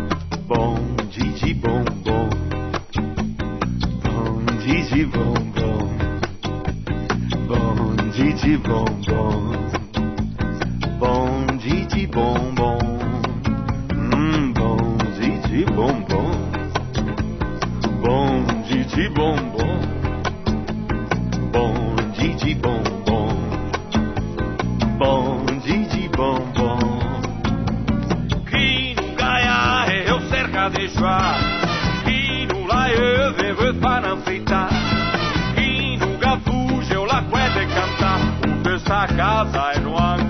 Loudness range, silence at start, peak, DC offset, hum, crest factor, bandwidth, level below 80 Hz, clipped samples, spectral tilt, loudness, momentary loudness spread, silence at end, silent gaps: 3 LU; 0 s; -4 dBFS; under 0.1%; none; 16 dB; 6.4 kHz; -30 dBFS; under 0.1%; -6.5 dB/octave; -20 LUFS; 6 LU; 0 s; none